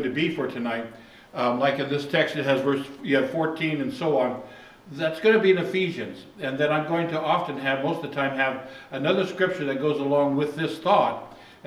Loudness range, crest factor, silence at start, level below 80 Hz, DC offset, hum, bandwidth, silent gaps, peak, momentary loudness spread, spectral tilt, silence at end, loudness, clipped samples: 2 LU; 20 dB; 0 s; -68 dBFS; under 0.1%; none; 14 kHz; none; -6 dBFS; 12 LU; -6.5 dB/octave; 0.15 s; -25 LUFS; under 0.1%